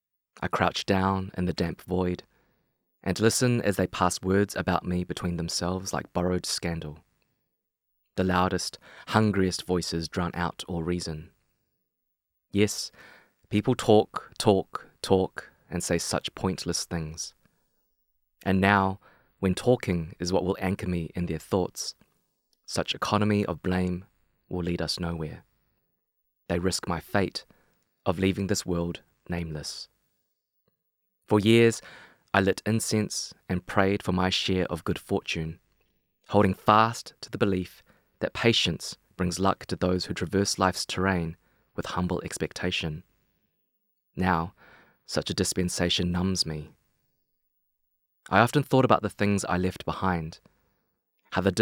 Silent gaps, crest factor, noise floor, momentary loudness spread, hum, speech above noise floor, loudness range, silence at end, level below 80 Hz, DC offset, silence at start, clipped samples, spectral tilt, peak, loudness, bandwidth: none; 24 dB; -82 dBFS; 13 LU; none; 55 dB; 6 LU; 0 s; -56 dBFS; under 0.1%; 0.4 s; under 0.1%; -5 dB/octave; -4 dBFS; -27 LUFS; 16.5 kHz